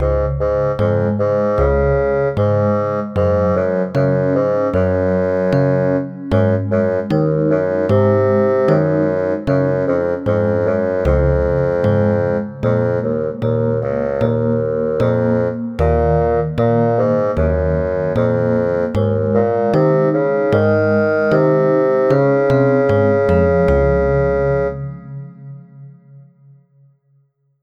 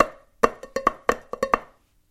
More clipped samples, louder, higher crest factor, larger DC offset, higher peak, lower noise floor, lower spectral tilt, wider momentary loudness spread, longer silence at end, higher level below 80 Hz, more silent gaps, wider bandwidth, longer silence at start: neither; first, -16 LUFS vs -25 LUFS; second, 14 dB vs 26 dB; neither; about the same, -2 dBFS vs 0 dBFS; first, -59 dBFS vs -52 dBFS; first, -10 dB/octave vs -4 dB/octave; about the same, 5 LU vs 3 LU; first, 1.4 s vs 0.45 s; first, -30 dBFS vs -48 dBFS; neither; second, 6.6 kHz vs 16 kHz; about the same, 0 s vs 0 s